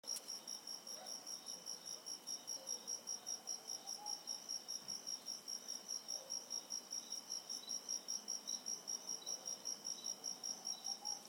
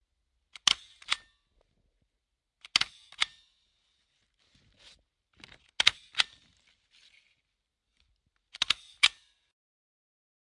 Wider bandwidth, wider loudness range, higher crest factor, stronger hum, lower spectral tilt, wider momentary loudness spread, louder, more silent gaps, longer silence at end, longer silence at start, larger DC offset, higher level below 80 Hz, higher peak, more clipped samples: first, 17 kHz vs 11.5 kHz; about the same, 2 LU vs 3 LU; second, 16 dB vs 36 dB; neither; about the same, 1 dB/octave vs 2 dB/octave; second, 4 LU vs 8 LU; second, -45 LUFS vs -28 LUFS; neither; second, 0 s vs 1.35 s; second, 0.05 s vs 0.65 s; neither; second, under -90 dBFS vs -70 dBFS; second, -32 dBFS vs 0 dBFS; neither